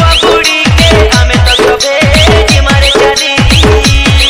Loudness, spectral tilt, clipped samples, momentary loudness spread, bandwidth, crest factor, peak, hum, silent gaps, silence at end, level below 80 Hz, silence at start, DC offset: -5 LUFS; -4 dB/octave; 6%; 2 LU; 16.5 kHz; 6 dB; 0 dBFS; none; none; 0 s; -12 dBFS; 0 s; under 0.1%